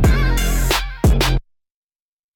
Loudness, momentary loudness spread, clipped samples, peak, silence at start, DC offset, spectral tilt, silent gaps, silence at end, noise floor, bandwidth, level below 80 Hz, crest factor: -18 LUFS; 4 LU; under 0.1%; -4 dBFS; 0 s; under 0.1%; -4.5 dB/octave; none; 0.95 s; under -90 dBFS; 18 kHz; -20 dBFS; 14 dB